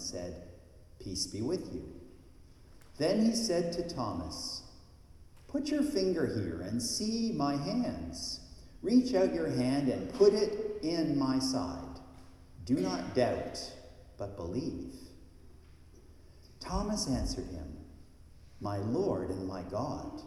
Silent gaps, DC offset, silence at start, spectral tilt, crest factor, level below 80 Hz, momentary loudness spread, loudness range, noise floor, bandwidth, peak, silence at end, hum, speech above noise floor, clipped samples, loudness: none; under 0.1%; 0 s; -5 dB/octave; 20 dB; -52 dBFS; 16 LU; 9 LU; -55 dBFS; 14 kHz; -14 dBFS; 0 s; none; 23 dB; under 0.1%; -33 LUFS